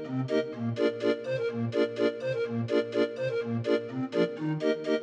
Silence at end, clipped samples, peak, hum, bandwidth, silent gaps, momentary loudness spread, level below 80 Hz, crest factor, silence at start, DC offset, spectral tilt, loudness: 0 s; under 0.1%; -14 dBFS; none; 8.8 kHz; none; 4 LU; -76 dBFS; 16 dB; 0 s; under 0.1%; -7 dB/octave; -30 LUFS